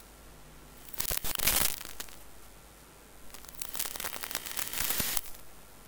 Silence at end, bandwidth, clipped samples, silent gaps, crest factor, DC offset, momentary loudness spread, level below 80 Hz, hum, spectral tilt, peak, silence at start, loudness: 0 s; 19.5 kHz; under 0.1%; none; 28 dB; under 0.1%; 25 LU; -50 dBFS; none; -0.5 dB/octave; -6 dBFS; 0 s; -31 LUFS